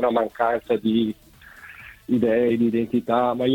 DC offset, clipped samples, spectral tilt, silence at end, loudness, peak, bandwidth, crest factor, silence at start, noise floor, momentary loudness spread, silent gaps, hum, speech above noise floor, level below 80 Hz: under 0.1%; under 0.1%; -7.5 dB/octave; 0 s; -22 LUFS; -6 dBFS; 16.5 kHz; 16 dB; 0 s; -45 dBFS; 20 LU; none; none; 24 dB; -56 dBFS